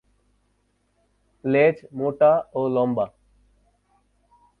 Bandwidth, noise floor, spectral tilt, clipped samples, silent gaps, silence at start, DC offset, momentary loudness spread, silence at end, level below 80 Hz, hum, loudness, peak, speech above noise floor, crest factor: 4.4 kHz; -68 dBFS; -9.5 dB/octave; under 0.1%; none; 1.45 s; under 0.1%; 10 LU; 1.55 s; -64 dBFS; 50 Hz at -55 dBFS; -22 LUFS; -6 dBFS; 48 dB; 18 dB